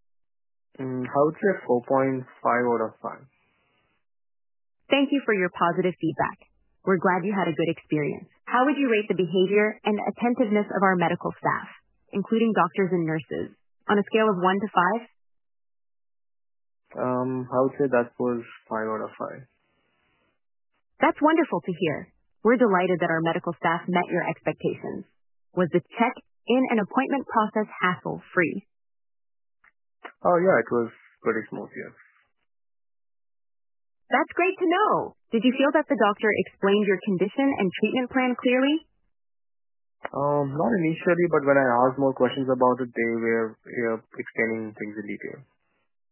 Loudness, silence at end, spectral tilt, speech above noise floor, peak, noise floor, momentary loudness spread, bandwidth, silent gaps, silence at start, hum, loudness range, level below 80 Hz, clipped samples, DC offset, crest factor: -24 LUFS; 0.7 s; -10 dB/octave; 47 dB; -6 dBFS; -70 dBFS; 12 LU; 3.2 kHz; none; 0.8 s; none; 5 LU; -68 dBFS; under 0.1%; under 0.1%; 20 dB